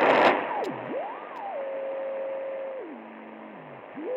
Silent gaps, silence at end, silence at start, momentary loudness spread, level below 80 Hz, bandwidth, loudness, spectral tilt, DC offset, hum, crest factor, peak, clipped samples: none; 0 s; 0 s; 21 LU; -78 dBFS; 10 kHz; -29 LUFS; -5 dB/octave; under 0.1%; none; 22 dB; -8 dBFS; under 0.1%